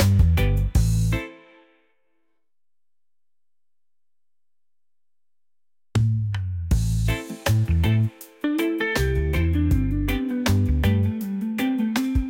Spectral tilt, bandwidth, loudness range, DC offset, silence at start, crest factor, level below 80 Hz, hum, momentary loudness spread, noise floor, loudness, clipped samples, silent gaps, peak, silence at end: -6.5 dB/octave; 17 kHz; 8 LU; under 0.1%; 0 s; 16 dB; -30 dBFS; none; 7 LU; under -90 dBFS; -23 LUFS; under 0.1%; none; -6 dBFS; 0 s